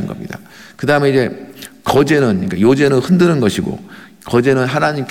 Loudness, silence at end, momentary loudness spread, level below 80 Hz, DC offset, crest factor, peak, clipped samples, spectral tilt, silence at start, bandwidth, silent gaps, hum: -14 LUFS; 0 s; 18 LU; -48 dBFS; 0.3%; 12 dB; -2 dBFS; under 0.1%; -6.5 dB/octave; 0 s; 17 kHz; none; none